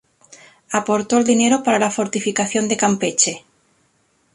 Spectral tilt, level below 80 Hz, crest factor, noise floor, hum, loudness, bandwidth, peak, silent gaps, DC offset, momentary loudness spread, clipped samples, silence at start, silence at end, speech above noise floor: -3 dB/octave; -62 dBFS; 18 dB; -62 dBFS; none; -18 LUFS; 11.5 kHz; -2 dBFS; none; under 0.1%; 6 LU; under 0.1%; 0.3 s; 0.95 s; 44 dB